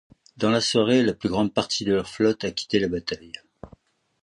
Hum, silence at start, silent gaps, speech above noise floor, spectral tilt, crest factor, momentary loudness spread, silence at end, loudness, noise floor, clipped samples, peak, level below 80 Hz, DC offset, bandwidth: none; 0.4 s; none; 32 dB; -4.5 dB/octave; 18 dB; 12 LU; 0.55 s; -23 LUFS; -55 dBFS; under 0.1%; -6 dBFS; -54 dBFS; under 0.1%; 11 kHz